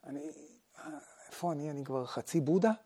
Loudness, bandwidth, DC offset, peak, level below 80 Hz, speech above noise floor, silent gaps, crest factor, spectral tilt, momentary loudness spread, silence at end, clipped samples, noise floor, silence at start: -35 LUFS; 16 kHz; under 0.1%; -16 dBFS; -84 dBFS; 23 dB; none; 20 dB; -6.5 dB/octave; 21 LU; 0.05 s; under 0.1%; -56 dBFS; 0.05 s